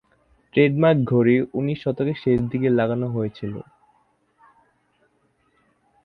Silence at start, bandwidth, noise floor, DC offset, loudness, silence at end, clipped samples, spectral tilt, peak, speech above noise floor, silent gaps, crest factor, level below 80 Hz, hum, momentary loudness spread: 0.55 s; 5 kHz; -65 dBFS; under 0.1%; -21 LUFS; 2.4 s; under 0.1%; -10 dB/octave; -4 dBFS; 45 dB; none; 20 dB; -56 dBFS; none; 11 LU